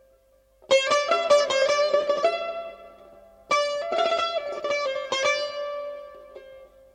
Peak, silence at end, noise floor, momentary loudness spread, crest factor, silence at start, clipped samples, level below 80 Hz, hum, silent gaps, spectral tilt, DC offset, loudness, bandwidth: -6 dBFS; 0.3 s; -61 dBFS; 17 LU; 18 dB; 0.7 s; under 0.1%; -66 dBFS; none; none; -0.5 dB/octave; under 0.1%; -24 LUFS; 10 kHz